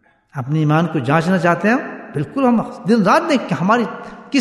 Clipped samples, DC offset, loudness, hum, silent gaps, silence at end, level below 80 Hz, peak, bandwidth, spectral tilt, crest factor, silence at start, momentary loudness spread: under 0.1%; under 0.1%; -17 LUFS; none; none; 0 s; -60 dBFS; -2 dBFS; 12.5 kHz; -7 dB/octave; 14 dB; 0.35 s; 12 LU